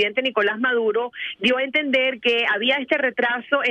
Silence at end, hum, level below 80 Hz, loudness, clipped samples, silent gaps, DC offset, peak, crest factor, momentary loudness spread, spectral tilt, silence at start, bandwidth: 0 s; none; -68 dBFS; -20 LUFS; under 0.1%; none; under 0.1%; -6 dBFS; 16 dB; 4 LU; -4 dB/octave; 0 s; 9 kHz